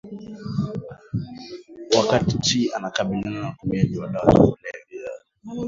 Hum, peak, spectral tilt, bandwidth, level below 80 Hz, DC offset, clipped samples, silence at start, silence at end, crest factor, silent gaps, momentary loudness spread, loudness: none; 0 dBFS; -5.5 dB/octave; 7.8 kHz; -44 dBFS; under 0.1%; under 0.1%; 0.05 s; 0 s; 22 dB; none; 19 LU; -22 LUFS